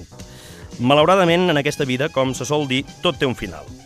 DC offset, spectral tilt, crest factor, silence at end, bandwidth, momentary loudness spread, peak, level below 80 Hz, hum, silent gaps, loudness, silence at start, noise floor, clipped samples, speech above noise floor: under 0.1%; -5 dB/octave; 18 dB; 0.05 s; 15 kHz; 24 LU; -2 dBFS; -46 dBFS; none; none; -18 LUFS; 0 s; -39 dBFS; under 0.1%; 20 dB